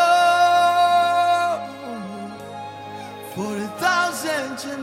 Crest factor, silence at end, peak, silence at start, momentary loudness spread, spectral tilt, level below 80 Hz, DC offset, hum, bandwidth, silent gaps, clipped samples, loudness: 14 dB; 0 s; -6 dBFS; 0 s; 19 LU; -3 dB/octave; -68 dBFS; under 0.1%; none; 16.5 kHz; none; under 0.1%; -19 LUFS